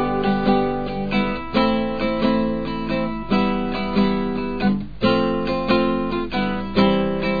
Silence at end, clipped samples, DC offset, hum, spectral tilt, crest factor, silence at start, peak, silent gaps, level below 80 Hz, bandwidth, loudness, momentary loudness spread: 0 s; under 0.1%; 2%; none; -8.5 dB/octave; 16 dB; 0 s; -4 dBFS; none; -38 dBFS; 5 kHz; -21 LUFS; 5 LU